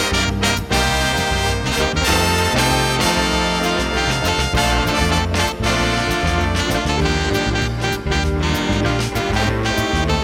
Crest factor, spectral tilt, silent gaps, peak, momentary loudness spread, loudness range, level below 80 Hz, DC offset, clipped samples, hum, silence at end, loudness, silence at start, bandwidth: 14 dB; -4 dB/octave; none; -4 dBFS; 3 LU; 2 LU; -26 dBFS; under 0.1%; under 0.1%; none; 0 s; -18 LUFS; 0 s; 17 kHz